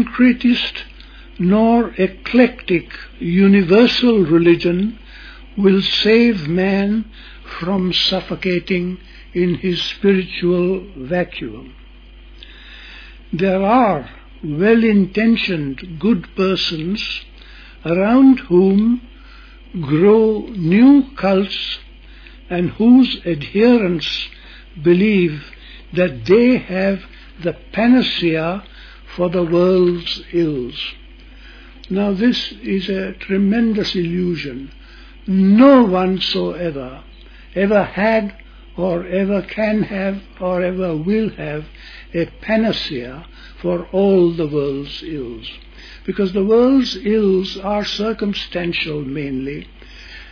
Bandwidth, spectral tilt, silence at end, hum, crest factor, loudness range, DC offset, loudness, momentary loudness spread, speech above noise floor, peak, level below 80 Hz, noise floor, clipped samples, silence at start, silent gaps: 5.4 kHz; -7.5 dB/octave; 0 s; none; 16 dB; 6 LU; under 0.1%; -16 LUFS; 17 LU; 24 dB; 0 dBFS; -40 dBFS; -40 dBFS; under 0.1%; 0 s; none